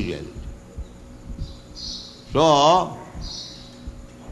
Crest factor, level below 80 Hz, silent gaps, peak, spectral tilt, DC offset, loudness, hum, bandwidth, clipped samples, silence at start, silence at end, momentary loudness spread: 22 dB; -40 dBFS; none; -4 dBFS; -4.5 dB/octave; under 0.1%; -21 LUFS; none; 12 kHz; under 0.1%; 0 s; 0 s; 24 LU